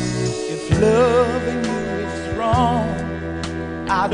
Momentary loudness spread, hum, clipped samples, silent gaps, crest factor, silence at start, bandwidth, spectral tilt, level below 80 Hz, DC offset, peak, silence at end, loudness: 11 LU; none; under 0.1%; none; 16 dB; 0 s; 10.5 kHz; -6 dB/octave; -34 dBFS; under 0.1%; -4 dBFS; 0 s; -20 LUFS